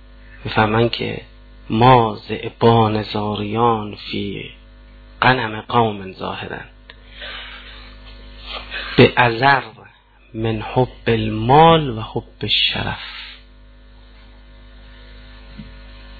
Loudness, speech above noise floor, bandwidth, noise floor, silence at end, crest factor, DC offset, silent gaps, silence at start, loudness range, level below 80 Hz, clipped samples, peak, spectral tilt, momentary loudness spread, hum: -17 LUFS; 31 dB; 4.8 kHz; -48 dBFS; 0 s; 20 dB; under 0.1%; none; 0.3 s; 7 LU; -40 dBFS; under 0.1%; 0 dBFS; -8.5 dB/octave; 23 LU; none